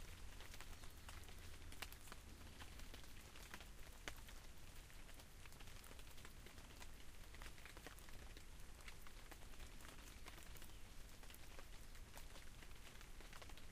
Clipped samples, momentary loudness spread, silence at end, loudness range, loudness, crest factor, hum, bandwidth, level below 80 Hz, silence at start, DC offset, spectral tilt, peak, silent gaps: under 0.1%; 5 LU; 0 s; 2 LU; -59 LUFS; 26 dB; none; 15.5 kHz; -58 dBFS; 0 s; under 0.1%; -3 dB/octave; -30 dBFS; none